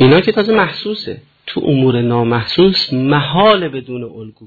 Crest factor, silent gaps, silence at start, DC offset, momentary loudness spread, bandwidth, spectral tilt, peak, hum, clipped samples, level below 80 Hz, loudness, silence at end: 14 dB; none; 0 s; under 0.1%; 15 LU; 4.8 kHz; -8 dB/octave; 0 dBFS; none; under 0.1%; -46 dBFS; -13 LUFS; 0 s